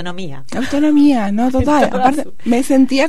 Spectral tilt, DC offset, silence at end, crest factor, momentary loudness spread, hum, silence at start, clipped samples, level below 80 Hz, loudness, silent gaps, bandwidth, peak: -5.5 dB/octave; 9%; 0 s; 14 dB; 13 LU; none; 0 s; under 0.1%; -38 dBFS; -14 LUFS; none; 13 kHz; -2 dBFS